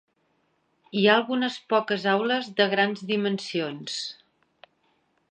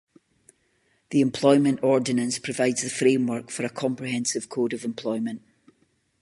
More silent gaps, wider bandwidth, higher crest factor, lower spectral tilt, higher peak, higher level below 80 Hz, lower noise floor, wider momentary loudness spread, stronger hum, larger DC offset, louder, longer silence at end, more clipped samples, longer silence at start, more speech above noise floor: neither; second, 9.4 kHz vs 11.5 kHz; about the same, 22 dB vs 20 dB; about the same, -4.5 dB/octave vs -4.5 dB/octave; about the same, -4 dBFS vs -6 dBFS; second, -80 dBFS vs -70 dBFS; about the same, -70 dBFS vs -68 dBFS; about the same, 11 LU vs 10 LU; neither; neither; about the same, -25 LUFS vs -24 LUFS; first, 1.15 s vs 0.85 s; neither; second, 0.95 s vs 1.1 s; about the same, 45 dB vs 44 dB